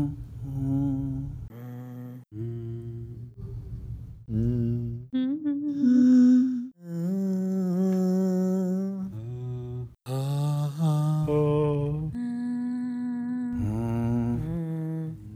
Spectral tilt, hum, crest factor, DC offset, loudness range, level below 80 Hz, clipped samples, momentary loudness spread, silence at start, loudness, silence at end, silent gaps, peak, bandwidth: -9 dB/octave; none; 14 dB; under 0.1%; 10 LU; -48 dBFS; under 0.1%; 16 LU; 0 s; -27 LUFS; 0 s; none; -12 dBFS; 14.5 kHz